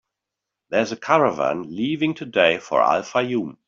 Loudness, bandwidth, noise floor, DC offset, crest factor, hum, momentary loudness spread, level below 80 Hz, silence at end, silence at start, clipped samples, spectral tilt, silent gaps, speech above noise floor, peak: -21 LUFS; 7.6 kHz; -84 dBFS; under 0.1%; 18 dB; none; 7 LU; -64 dBFS; 0.15 s; 0.7 s; under 0.1%; -5 dB/octave; none; 63 dB; -4 dBFS